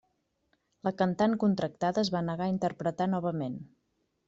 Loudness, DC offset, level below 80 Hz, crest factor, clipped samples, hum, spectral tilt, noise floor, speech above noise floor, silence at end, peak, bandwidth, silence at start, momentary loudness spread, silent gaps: -30 LUFS; under 0.1%; -66 dBFS; 18 dB; under 0.1%; none; -7 dB/octave; -76 dBFS; 47 dB; 0.6 s; -14 dBFS; 7.8 kHz; 0.85 s; 9 LU; none